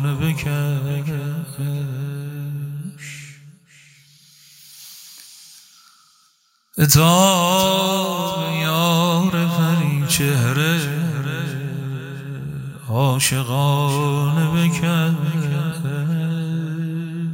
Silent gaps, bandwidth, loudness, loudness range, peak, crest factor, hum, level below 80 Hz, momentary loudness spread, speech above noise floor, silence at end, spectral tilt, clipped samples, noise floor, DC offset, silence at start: none; 16.5 kHz; -19 LUFS; 15 LU; 0 dBFS; 20 dB; none; -50 dBFS; 16 LU; 43 dB; 0 s; -5 dB/octave; under 0.1%; -61 dBFS; under 0.1%; 0 s